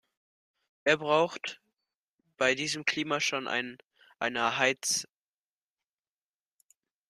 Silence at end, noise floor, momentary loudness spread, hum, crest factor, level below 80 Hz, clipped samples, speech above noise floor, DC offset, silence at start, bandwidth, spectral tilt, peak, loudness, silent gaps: 2.05 s; under -90 dBFS; 10 LU; none; 24 dB; -76 dBFS; under 0.1%; over 61 dB; under 0.1%; 0.85 s; 14.5 kHz; -2 dB/octave; -8 dBFS; -29 LUFS; 1.97-2.19 s